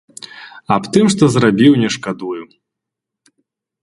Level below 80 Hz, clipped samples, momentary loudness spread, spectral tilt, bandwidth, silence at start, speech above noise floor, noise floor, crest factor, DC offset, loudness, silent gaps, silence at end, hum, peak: -52 dBFS; under 0.1%; 22 LU; -5.5 dB/octave; 11.5 kHz; 0.35 s; 68 dB; -82 dBFS; 16 dB; under 0.1%; -14 LUFS; none; 1.4 s; none; 0 dBFS